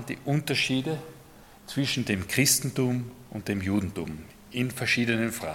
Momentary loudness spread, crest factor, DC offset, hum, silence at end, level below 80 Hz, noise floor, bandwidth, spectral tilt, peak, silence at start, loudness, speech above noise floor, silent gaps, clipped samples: 14 LU; 20 dB; under 0.1%; none; 0 s; -58 dBFS; -51 dBFS; 17.5 kHz; -4 dB/octave; -8 dBFS; 0 s; -27 LUFS; 23 dB; none; under 0.1%